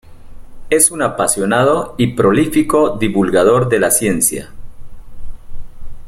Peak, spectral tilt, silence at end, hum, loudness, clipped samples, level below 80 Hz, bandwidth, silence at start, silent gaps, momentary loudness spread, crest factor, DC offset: 0 dBFS; -4.5 dB/octave; 0 s; none; -13 LUFS; under 0.1%; -34 dBFS; 16.5 kHz; 0.05 s; none; 4 LU; 16 dB; under 0.1%